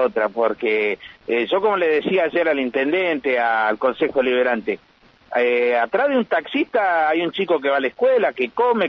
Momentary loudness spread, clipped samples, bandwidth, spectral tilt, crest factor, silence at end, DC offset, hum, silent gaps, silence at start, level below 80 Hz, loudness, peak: 3 LU; under 0.1%; 5.8 kHz; -7 dB/octave; 12 dB; 0 s; under 0.1%; none; none; 0 s; -62 dBFS; -20 LUFS; -6 dBFS